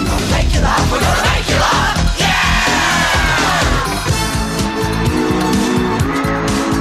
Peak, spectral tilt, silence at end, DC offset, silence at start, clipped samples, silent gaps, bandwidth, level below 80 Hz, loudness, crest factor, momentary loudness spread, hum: -2 dBFS; -4 dB/octave; 0 s; under 0.1%; 0 s; under 0.1%; none; 14.5 kHz; -22 dBFS; -14 LUFS; 12 dB; 4 LU; none